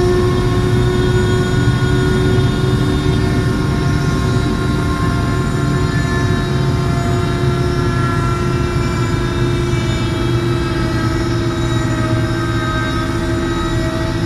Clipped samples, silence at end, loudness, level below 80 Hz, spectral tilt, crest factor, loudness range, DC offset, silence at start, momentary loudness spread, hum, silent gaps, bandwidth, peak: under 0.1%; 0 s; -16 LUFS; -24 dBFS; -6.5 dB/octave; 12 dB; 2 LU; under 0.1%; 0 s; 3 LU; none; none; 13 kHz; -2 dBFS